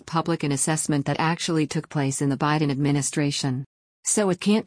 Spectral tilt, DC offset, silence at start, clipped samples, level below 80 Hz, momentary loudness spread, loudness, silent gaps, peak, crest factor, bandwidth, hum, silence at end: -4.5 dB/octave; under 0.1%; 0.05 s; under 0.1%; -60 dBFS; 5 LU; -24 LUFS; 3.66-4.03 s; -10 dBFS; 14 dB; 10.5 kHz; none; 0 s